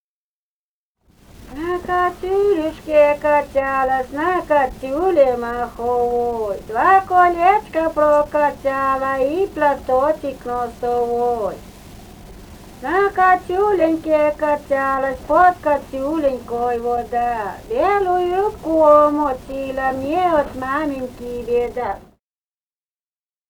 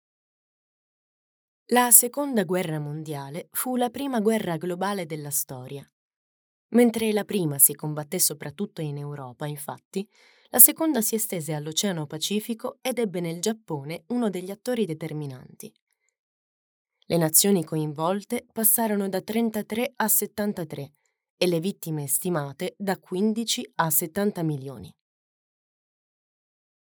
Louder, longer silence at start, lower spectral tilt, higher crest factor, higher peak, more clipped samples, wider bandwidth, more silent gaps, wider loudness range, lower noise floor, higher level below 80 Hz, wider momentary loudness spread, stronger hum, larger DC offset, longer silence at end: first, -18 LUFS vs -24 LUFS; second, 1.4 s vs 1.7 s; first, -6 dB/octave vs -3.5 dB/octave; second, 18 dB vs 26 dB; about the same, -2 dBFS vs 0 dBFS; neither; about the same, over 20 kHz vs over 20 kHz; second, none vs 5.93-6.69 s, 9.85-9.91 s, 15.82-15.87 s, 16.19-16.85 s, 21.30-21.38 s; second, 5 LU vs 8 LU; about the same, under -90 dBFS vs under -90 dBFS; first, -44 dBFS vs -76 dBFS; second, 10 LU vs 16 LU; neither; neither; second, 1.5 s vs 2.05 s